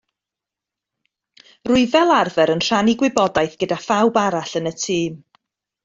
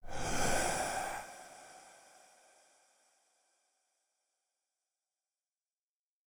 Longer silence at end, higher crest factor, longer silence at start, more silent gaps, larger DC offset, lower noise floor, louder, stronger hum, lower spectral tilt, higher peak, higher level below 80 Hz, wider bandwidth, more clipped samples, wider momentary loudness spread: second, 0.7 s vs 4.35 s; about the same, 18 dB vs 22 dB; first, 1.65 s vs 0.05 s; neither; neither; second, -86 dBFS vs under -90 dBFS; first, -18 LUFS vs -36 LUFS; neither; first, -4.5 dB/octave vs -2.5 dB/octave; first, -2 dBFS vs -20 dBFS; about the same, -54 dBFS vs -52 dBFS; second, 7.8 kHz vs over 20 kHz; neither; second, 9 LU vs 24 LU